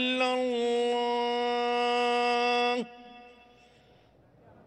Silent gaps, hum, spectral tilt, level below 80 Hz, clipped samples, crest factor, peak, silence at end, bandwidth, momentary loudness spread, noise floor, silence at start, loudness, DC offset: none; none; -2.5 dB/octave; -72 dBFS; under 0.1%; 14 dB; -16 dBFS; 1.35 s; 11 kHz; 4 LU; -60 dBFS; 0 s; -27 LUFS; under 0.1%